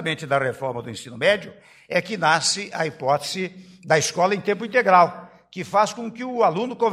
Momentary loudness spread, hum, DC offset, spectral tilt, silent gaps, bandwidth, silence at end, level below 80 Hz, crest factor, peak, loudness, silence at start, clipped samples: 15 LU; none; under 0.1%; -3.5 dB/octave; none; 15 kHz; 0 s; -66 dBFS; 20 dB; -2 dBFS; -21 LUFS; 0 s; under 0.1%